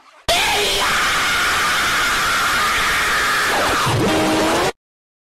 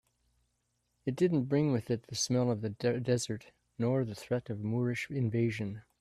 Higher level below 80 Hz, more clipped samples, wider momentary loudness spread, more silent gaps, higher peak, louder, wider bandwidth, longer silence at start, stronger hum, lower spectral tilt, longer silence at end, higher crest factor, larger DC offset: first, -38 dBFS vs -68 dBFS; neither; second, 1 LU vs 9 LU; neither; first, -8 dBFS vs -16 dBFS; first, -16 LUFS vs -33 LUFS; first, 16 kHz vs 13.5 kHz; second, 0.3 s vs 1.05 s; second, none vs 60 Hz at -50 dBFS; second, -2.5 dB/octave vs -6 dB/octave; first, 0.55 s vs 0.2 s; second, 10 dB vs 16 dB; neither